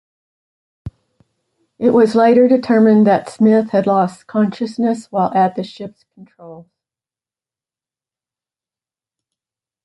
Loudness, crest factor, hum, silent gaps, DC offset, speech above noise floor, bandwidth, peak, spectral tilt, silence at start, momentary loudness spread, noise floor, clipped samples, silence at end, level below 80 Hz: -14 LUFS; 16 dB; none; none; under 0.1%; over 76 dB; 11.5 kHz; -2 dBFS; -7.5 dB/octave; 0.85 s; 22 LU; under -90 dBFS; under 0.1%; 3.25 s; -56 dBFS